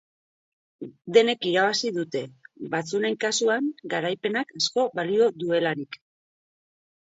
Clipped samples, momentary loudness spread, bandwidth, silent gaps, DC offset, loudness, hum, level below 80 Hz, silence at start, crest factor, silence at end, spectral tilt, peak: under 0.1%; 19 LU; 8 kHz; none; under 0.1%; -25 LUFS; none; -76 dBFS; 0.8 s; 22 dB; 1.1 s; -3.5 dB/octave; -4 dBFS